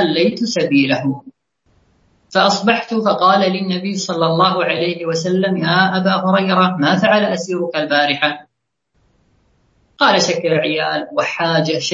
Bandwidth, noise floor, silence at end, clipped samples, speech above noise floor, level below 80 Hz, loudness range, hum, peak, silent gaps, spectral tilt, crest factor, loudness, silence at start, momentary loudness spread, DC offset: 7.8 kHz; -71 dBFS; 0 s; under 0.1%; 56 dB; -62 dBFS; 3 LU; none; 0 dBFS; none; -4.5 dB/octave; 16 dB; -15 LUFS; 0 s; 7 LU; under 0.1%